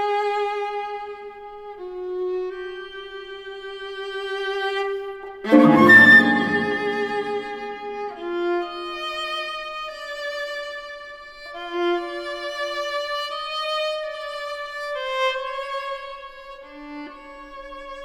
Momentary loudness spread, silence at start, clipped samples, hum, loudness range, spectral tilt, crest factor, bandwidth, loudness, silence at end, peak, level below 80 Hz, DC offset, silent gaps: 20 LU; 0 s; under 0.1%; none; 14 LU; -5 dB/octave; 22 dB; 15.5 kHz; -21 LUFS; 0 s; -2 dBFS; -58 dBFS; under 0.1%; none